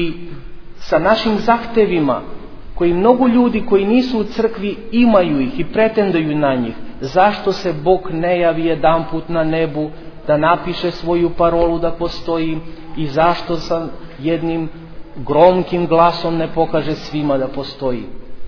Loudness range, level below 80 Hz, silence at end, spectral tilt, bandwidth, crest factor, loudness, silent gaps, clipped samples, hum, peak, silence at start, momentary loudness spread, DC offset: 3 LU; -36 dBFS; 0 s; -7.5 dB/octave; 5.4 kHz; 16 dB; -16 LUFS; none; under 0.1%; none; 0 dBFS; 0 s; 13 LU; under 0.1%